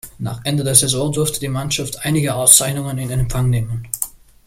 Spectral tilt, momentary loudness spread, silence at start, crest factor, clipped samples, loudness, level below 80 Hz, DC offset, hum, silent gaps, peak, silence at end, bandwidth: -3.5 dB/octave; 14 LU; 0.05 s; 18 dB; under 0.1%; -16 LUFS; -36 dBFS; under 0.1%; none; none; 0 dBFS; 0.4 s; 17 kHz